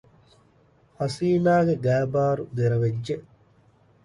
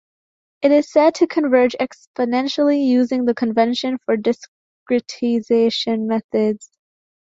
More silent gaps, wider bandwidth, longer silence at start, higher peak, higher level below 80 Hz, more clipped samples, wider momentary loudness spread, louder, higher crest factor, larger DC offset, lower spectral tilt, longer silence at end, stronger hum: second, none vs 2.07-2.14 s, 4.48-4.86 s, 6.24-6.29 s; first, 11.5 kHz vs 7.8 kHz; first, 1 s vs 0.6 s; second, -10 dBFS vs -2 dBFS; first, -58 dBFS vs -64 dBFS; neither; first, 11 LU vs 7 LU; second, -24 LUFS vs -18 LUFS; about the same, 16 dB vs 16 dB; neither; first, -8 dB/octave vs -5 dB/octave; about the same, 0.85 s vs 0.75 s; neither